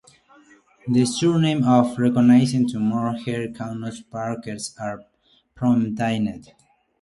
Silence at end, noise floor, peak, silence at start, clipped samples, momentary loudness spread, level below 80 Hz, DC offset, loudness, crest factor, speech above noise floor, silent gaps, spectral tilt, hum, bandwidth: 0.6 s; -56 dBFS; -2 dBFS; 0.85 s; under 0.1%; 16 LU; -58 dBFS; under 0.1%; -21 LUFS; 20 dB; 35 dB; none; -6.5 dB/octave; none; 11.5 kHz